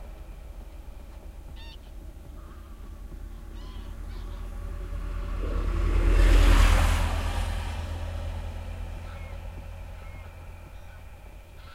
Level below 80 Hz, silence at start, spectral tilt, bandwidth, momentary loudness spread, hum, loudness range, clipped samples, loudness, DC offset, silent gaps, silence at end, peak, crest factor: -28 dBFS; 0 s; -5.5 dB/octave; 13.5 kHz; 23 LU; none; 18 LU; under 0.1%; -29 LUFS; under 0.1%; none; 0 s; -8 dBFS; 20 dB